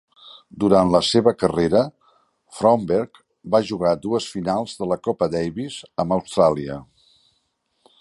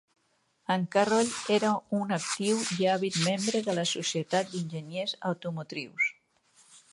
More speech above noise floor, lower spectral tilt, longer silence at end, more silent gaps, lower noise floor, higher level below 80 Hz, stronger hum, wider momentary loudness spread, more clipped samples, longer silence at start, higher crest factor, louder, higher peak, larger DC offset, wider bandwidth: first, 50 dB vs 43 dB; first, -6 dB/octave vs -4 dB/octave; first, 1.2 s vs 0.15 s; neither; about the same, -70 dBFS vs -72 dBFS; first, -50 dBFS vs -74 dBFS; neither; about the same, 11 LU vs 9 LU; neither; second, 0.25 s vs 0.7 s; about the same, 20 dB vs 20 dB; first, -21 LUFS vs -29 LUFS; first, -2 dBFS vs -10 dBFS; neither; about the same, 11.5 kHz vs 11.5 kHz